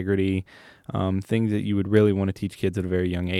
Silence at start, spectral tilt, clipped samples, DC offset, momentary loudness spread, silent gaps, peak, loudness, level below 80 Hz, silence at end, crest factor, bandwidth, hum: 0 s; -8 dB/octave; under 0.1%; under 0.1%; 9 LU; none; -4 dBFS; -24 LUFS; -50 dBFS; 0 s; 20 dB; 13 kHz; none